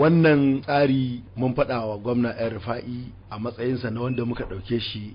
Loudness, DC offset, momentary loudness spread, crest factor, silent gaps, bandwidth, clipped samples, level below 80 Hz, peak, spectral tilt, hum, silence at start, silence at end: -24 LUFS; under 0.1%; 13 LU; 14 dB; none; 5.4 kHz; under 0.1%; -48 dBFS; -10 dBFS; -12 dB/octave; none; 0 s; 0 s